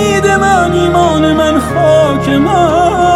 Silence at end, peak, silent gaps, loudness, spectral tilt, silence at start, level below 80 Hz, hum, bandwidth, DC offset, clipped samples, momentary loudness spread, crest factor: 0 s; 0 dBFS; none; -9 LUFS; -5.5 dB/octave; 0 s; -30 dBFS; none; 14.5 kHz; under 0.1%; under 0.1%; 2 LU; 8 dB